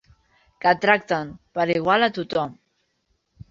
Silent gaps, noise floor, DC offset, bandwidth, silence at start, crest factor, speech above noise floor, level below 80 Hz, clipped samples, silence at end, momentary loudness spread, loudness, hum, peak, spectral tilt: none; -71 dBFS; under 0.1%; 7.6 kHz; 0.65 s; 22 dB; 50 dB; -60 dBFS; under 0.1%; 1 s; 8 LU; -22 LUFS; none; -2 dBFS; -6 dB/octave